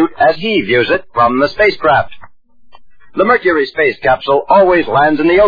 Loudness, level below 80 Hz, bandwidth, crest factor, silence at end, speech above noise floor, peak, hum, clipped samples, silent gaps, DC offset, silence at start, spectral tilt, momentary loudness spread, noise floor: -12 LUFS; -40 dBFS; 5 kHz; 12 dB; 0 s; 36 dB; 0 dBFS; none; under 0.1%; none; under 0.1%; 0 s; -7 dB/octave; 5 LU; -47 dBFS